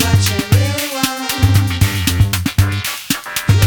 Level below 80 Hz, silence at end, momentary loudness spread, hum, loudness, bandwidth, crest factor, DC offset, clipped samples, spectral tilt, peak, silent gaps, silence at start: -30 dBFS; 0 s; 5 LU; none; -15 LUFS; over 20 kHz; 14 dB; under 0.1%; under 0.1%; -4.5 dB/octave; 0 dBFS; none; 0 s